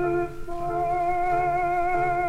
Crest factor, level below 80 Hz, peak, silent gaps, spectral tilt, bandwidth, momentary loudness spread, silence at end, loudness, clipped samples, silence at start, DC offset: 10 dB; -40 dBFS; -14 dBFS; none; -7.5 dB/octave; 12.5 kHz; 7 LU; 0 s; -25 LUFS; under 0.1%; 0 s; under 0.1%